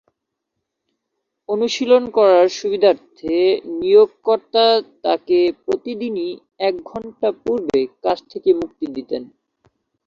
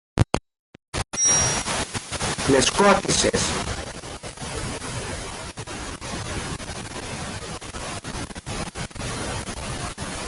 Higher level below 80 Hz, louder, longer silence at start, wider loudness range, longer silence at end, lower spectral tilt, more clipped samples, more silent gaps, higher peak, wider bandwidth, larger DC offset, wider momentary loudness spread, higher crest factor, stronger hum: second, -60 dBFS vs -40 dBFS; first, -18 LUFS vs -25 LUFS; first, 1.5 s vs 0.15 s; second, 6 LU vs 11 LU; first, 0.8 s vs 0 s; first, -4.5 dB/octave vs -3 dB/octave; neither; second, none vs 0.59-0.73 s, 0.88-0.92 s; about the same, -2 dBFS vs -2 dBFS; second, 7.4 kHz vs 11.5 kHz; neither; about the same, 13 LU vs 15 LU; second, 16 dB vs 24 dB; neither